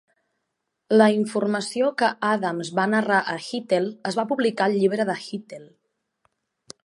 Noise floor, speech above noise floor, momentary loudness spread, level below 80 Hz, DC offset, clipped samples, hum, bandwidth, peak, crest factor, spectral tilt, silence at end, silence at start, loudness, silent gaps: -79 dBFS; 57 dB; 11 LU; -76 dBFS; under 0.1%; under 0.1%; none; 11.5 kHz; -4 dBFS; 20 dB; -5 dB/octave; 1.2 s; 0.9 s; -22 LUFS; none